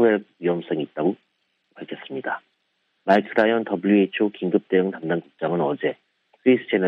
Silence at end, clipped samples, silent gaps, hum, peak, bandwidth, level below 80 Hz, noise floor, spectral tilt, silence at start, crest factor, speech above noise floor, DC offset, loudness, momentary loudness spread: 0 s; under 0.1%; none; none; -2 dBFS; 6 kHz; -70 dBFS; -71 dBFS; -8.5 dB/octave; 0 s; 20 dB; 50 dB; under 0.1%; -23 LUFS; 14 LU